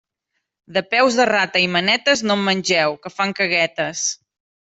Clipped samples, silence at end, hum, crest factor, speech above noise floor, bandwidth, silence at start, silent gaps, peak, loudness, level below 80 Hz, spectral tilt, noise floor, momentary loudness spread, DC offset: under 0.1%; 0.5 s; none; 16 dB; 57 dB; 8.4 kHz; 0.7 s; none; -4 dBFS; -18 LUFS; -64 dBFS; -2.5 dB/octave; -76 dBFS; 7 LU; under 0.1%